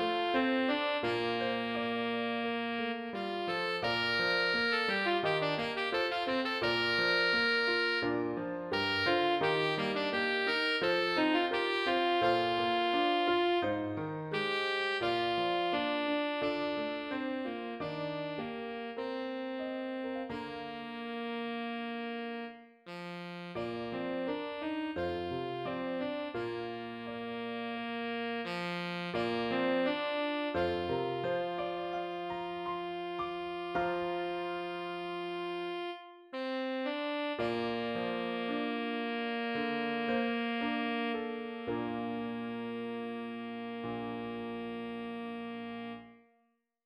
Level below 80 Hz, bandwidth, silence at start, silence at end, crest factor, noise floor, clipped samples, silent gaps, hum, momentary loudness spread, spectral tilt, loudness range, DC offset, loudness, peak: -70 dBFS; 12.5 kHz; 0 s; 0.7 s; 20 dB; -76 dBFS; under 0.1%; none; none; 11 LU; -5.5 dB/octave; 9 LU; under 0.1%; -34 LUFS; -16 dBFS